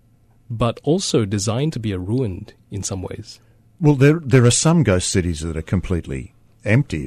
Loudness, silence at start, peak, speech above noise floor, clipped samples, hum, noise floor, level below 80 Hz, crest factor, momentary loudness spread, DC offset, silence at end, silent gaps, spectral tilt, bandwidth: -19 LUFS; 0.5 s; -2 dBFS; 35 dB; under 0.1%; none; -53 dBFS; -40 dBFS; 16 dB; 17 LU; under 0.1%; 0 s; none; -5.5 dB/octave; 13.5 kHz